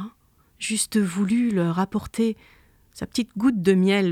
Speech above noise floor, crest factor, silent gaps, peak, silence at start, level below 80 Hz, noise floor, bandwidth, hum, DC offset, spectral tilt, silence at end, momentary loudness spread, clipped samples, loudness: 38 dB; 18 dB; none; -6 dBFS; 0 s; -56 dBFS; -60 dBFS; 15 kHz; none; under 0.1%; -5 dB/octave; 0 s; 12 LU; under 0.1%; -23 LUFS